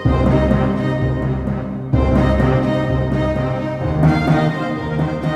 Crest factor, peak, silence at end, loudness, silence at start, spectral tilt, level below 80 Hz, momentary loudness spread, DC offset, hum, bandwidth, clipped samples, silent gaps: 14 dB; -2 dBFS; 0 s; -17 LUFS; 0 s; -8.5 dB/octave; -26 dBFS; 6 LU; under 0.1%; none; 8.8 kHz; under 0.1%; none